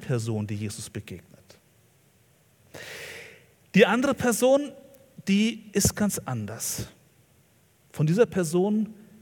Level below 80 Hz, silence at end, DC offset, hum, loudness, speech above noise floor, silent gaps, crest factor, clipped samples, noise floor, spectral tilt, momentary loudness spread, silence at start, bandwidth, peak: -56 dBFS; 0.3 s; under 0.1%; none; -25 LUFS; 37 dB; none; 22 dB; under 0.1%; -62 dBFS; -5 dB/octave; 19 LU; 0 s; 18 kHz; -4 dBFS